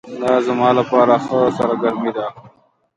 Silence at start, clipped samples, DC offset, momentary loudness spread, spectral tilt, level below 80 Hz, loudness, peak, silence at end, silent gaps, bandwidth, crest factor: 0.05 s; under 0.1%; under 0.1%; 9 LU; -7 dB/octave; -58 dBFS; -16 LUFS; 0 dBFS; 0.5 s; none; 11 kHz; 16 dB